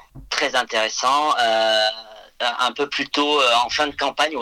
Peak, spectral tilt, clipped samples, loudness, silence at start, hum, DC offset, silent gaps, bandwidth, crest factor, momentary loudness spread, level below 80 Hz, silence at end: -2 dBFS; -1 dB/octave; under 0.1%; -19 LUFS; 0.15 s; none; under 0.1%; none; 16 kHz; 18 dB; 7 LU; -54 dBFS; 0 s